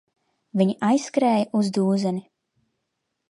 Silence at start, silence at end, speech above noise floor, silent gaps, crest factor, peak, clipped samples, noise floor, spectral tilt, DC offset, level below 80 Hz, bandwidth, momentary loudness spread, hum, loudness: 0.55 s; 1.1 s; 57 dB; none; 18 dB; -6 dBFS; under 0.1%; -78 dBFS; -6.5 dB/octave; under 0.1%; -74 dBFS; 11.5 kHz; 7 LU; none; -22 LUFS